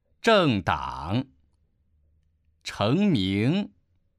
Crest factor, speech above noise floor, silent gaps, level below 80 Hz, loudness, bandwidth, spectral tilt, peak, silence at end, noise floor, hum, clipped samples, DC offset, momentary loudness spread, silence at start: 18 dB; 43 dB; none; -52 dBFS; -24 LUFS; 12.5 kHz; -6.5 dB/octave; -8 dBFS; 0.5 s; -67 dBFS; none; under 0.1%; under 0.1%; 17 LU; 0.25 s